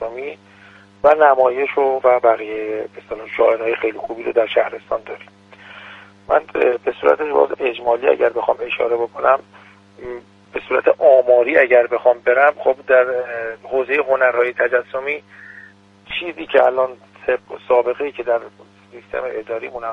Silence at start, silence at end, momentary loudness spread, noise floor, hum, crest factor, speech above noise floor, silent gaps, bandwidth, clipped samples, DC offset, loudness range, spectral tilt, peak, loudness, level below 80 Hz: 0 s; 0 s; 16 LU; -45 dBFS; none; 18 dB; 28 dB; none; 5.4 kHz; under 0.1%; under 0.1%; 6 LU; -5.5 dB/octave; 0 dBFS; -17 LUFS; -58 dBFS